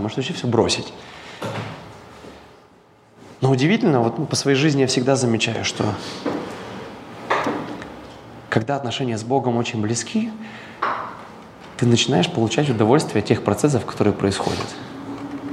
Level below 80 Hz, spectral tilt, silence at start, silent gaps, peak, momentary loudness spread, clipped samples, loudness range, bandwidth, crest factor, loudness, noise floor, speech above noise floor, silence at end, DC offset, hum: -56 dBFS; -5 dB/octave; 0 s; none; 0 dBFS; 20 LU; under 0.1%; 7 LU; 13.5 kHz; 20 dB; -21 LUFS; -51 dBFS; 32 dB; 0 s; under 0.1%; none